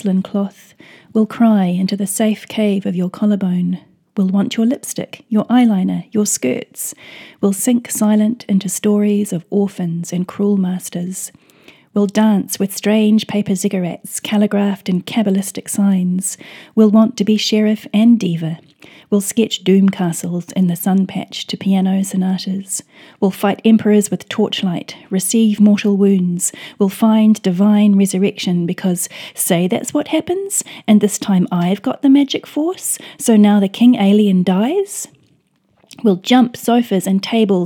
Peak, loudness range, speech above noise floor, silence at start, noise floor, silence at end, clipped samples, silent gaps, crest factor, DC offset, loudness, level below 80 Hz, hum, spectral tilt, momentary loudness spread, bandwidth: 0 dBFS; 4 LU; 44 dB; 0.05 s; -59 dBFS; 0 s; under 0.1%; none; 14 dB; under 0.1%; -16 LUFS; -68 dBFS; none; -5.5 dB/octave; 10 LU; 18 kHz